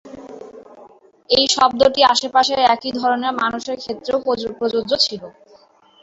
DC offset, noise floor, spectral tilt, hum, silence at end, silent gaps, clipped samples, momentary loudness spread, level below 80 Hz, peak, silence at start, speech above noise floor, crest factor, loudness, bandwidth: under 0.1%; -51 dBFS; -2 dB/octave; none; 0.75 s; none; under 0.1%; 16 LU; -54 dBFS; 0 dBFS; 0.05 s; 33 dB; 18 dB; -17 LUFS; 8 kHz